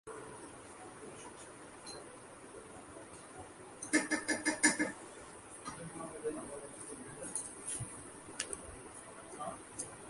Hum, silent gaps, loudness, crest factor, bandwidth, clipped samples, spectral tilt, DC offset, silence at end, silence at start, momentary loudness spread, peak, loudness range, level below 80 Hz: none; none; -39 LUFS; 30 dB; 11.5 kHz; under 0.1%; -2.5 dB/octave; under 0.1%; 0 s; 0.05 s; 18 LU; -12 dBFS; 14 LU; -68 dBFS